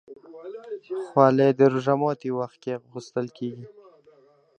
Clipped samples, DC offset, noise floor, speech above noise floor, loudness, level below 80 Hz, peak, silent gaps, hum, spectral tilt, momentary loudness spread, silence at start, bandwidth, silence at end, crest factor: under 0.1%; under 0.1%; -58 dBFS; 34 dB; -24 LUFS; -74 dBFS; -4 dBFS; none; none; -8 dB/octave; 21 LU; 0.1 s; 8.4 kHz; 0.9 s; 22 dB